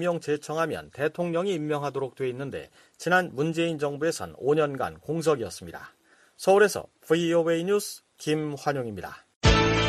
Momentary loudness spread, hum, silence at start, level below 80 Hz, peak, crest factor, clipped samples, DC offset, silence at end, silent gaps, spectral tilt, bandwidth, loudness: 14 LU; none; 0 s; -42 dBFS; -6 dBFS; 20 dB; under 0.1%; under 0.1%; 0 s; 9.36-9.41 s; -5 dB/octave; 14 kHz; -27 LUFS